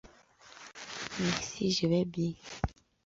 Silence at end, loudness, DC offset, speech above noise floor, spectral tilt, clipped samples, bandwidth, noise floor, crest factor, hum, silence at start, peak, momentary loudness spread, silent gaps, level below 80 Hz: 0.35 s; -33 LUFS; under 0.1%; 26 dB; -5 dB/octave; under 0.1%; 7.8 kHz; -58 dBFS; 22 dB; none; 0.05 s; -12 dBFS; 16 LU; none; -50 dBFS